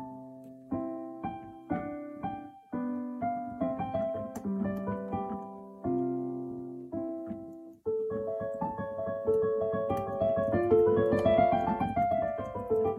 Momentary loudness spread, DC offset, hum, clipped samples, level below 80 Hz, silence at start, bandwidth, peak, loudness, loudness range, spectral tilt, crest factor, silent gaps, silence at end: 15 LU; under 0.1%; none; under 0.1%; -58 dBFS; 0 s; 13 kHz; -12 dBFS; -32 LUFS; 9 LU; -9 dB/octave; 20 dB; none; 0 s